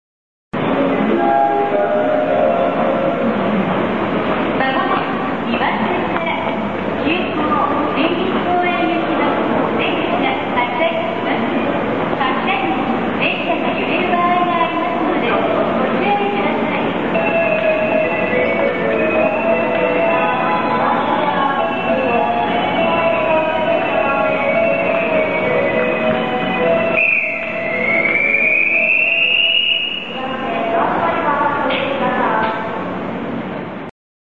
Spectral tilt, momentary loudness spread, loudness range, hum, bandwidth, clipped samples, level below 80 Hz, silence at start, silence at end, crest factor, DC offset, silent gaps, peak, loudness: -7 dB/octave; 6 LU; 4 LU; none; 7.2 kHz; under 0.1%; -50 dBFS; 0.5 s; 0.45 s; 14 dB; 1%; none; -2 dBFS; -16 LUFS